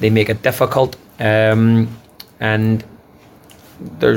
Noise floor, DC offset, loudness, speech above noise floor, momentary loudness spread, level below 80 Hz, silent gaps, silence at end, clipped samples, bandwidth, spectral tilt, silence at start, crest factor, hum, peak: -45 dBFS; under 0.1%; -16 LUFS; 30 dB; 12 LU; -48 dBFS; none; 0 s; under 0.1%; 17 kHz; -7 dB/octave; 0 s; 16 dB; none; 0 dBFS